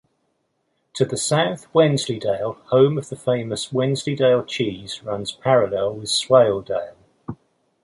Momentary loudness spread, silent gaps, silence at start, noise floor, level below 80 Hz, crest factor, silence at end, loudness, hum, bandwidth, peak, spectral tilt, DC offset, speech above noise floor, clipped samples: 13 LU; none; 0.95 s; -70 dBFS; -58 dBFS; 18 dB; 0.5 s; -20 LUFS; none; 11.5 kHz; -2 dBFS; -5 dB/octave; under 0.1%; 51 dB; under 0.1%